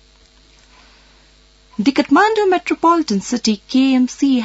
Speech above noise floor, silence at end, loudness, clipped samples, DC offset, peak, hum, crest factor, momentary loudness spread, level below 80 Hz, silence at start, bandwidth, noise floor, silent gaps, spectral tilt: 35 dB; 0 s; -15 LUFS; under 0.1%; under 0.1%; -2 dBFS; none; 14 dB; 6 LU; -52 dBFS; 1.8 s; 8 kHz; -50 dBFS; none; -4.5 dB/octave